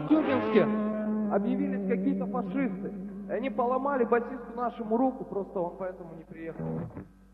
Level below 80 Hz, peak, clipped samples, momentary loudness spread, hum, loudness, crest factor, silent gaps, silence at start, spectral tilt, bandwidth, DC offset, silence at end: -58 dBFS; -10 dBFS; under 0.1%; 13 LU; none; -30 LUFS; 20 dB; none; 0 s; -9.5 dB/octave; 5 kHz; under 0.1%; 0.25 s